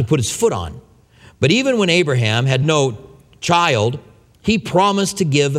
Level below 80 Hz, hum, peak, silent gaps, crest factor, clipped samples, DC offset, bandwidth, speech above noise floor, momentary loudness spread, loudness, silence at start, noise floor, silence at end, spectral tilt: -46 dBFS; none; 0 dBFS; none; 16 dB; under 0.1%; under 0.1%; 15 kHz; 31 dB; 11 LU; -17 LUFS; 0 s; -47 dBFS; 0 s; -5 dB/octave